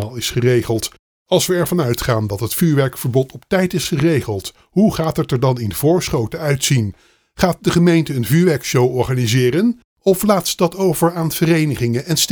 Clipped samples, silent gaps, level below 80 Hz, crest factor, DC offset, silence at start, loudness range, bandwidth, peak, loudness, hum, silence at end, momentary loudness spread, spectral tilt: under 0.1%; 0.99-1.26 s, 9.84-9.97 s; -42 dBFS; 16 dB; under 0.1%; 0 s; 2 LU; over 20 kHz; 0 dBFS; -17 LUFS; none; 0 s; 5 LU; -5.5 dB/octave